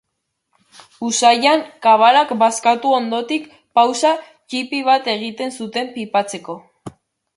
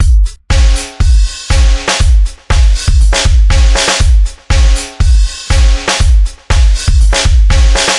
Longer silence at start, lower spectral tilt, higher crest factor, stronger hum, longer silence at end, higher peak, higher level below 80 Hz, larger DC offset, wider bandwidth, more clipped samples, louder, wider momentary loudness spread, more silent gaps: first, 1 s vs 0 s; about the same, -2.5 dB/octave vs -3.5 dB/octave; first, 16 dB vs 8 dB; neither; first, 0.5 s vs 0 s; about the same, 0 dBFS vs 0 dBFS; second, -68 dBFS vs -8 dBFS; neither; about the same, 11.5 kHz vs 11.5 kHz; neither; second, -17 LUFS vs -11 LUFS; first, 14 LU vs 4 LU; neither